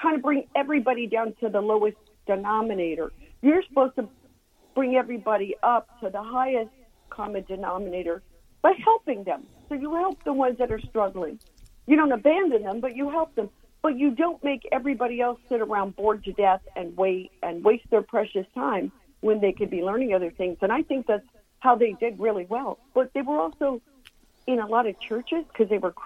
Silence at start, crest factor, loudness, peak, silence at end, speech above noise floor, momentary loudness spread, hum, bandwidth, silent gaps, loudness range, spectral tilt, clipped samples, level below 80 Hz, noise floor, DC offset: 0 s; 20 dB; -25 LUFS; -6 dBFS; 0 s; 35 dB; 11 LU; none; 11 kHz; none; 3 LU; -7.5 dB/octave; under 0.1%; -54 dBFS; -60 dBFS; under 0.1%